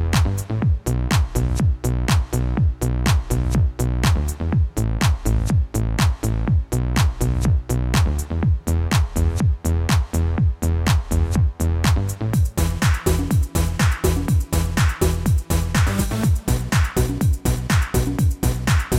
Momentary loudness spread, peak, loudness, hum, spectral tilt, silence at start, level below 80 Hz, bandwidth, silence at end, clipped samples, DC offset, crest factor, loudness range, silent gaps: 3 LU; -4 dBFS; -21 LUFS; none; -5.5 dB/octave; 0 s; -24 dBFS; 17 kHz; 0 s; under 0.1%; under 0.1%; 14 dB; 1 LU; none